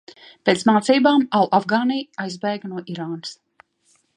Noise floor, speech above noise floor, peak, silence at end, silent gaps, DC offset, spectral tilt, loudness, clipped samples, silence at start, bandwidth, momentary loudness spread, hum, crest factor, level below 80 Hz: -63 dBFS; 44 dB; 0 dBFS; 0.85 s; none; under 0.1%; -5 dB/octave; -20 LUFS; under 0.1%; 0.45 s; 11 kHz; 14 LU; none; 20 dB; -72 dBFS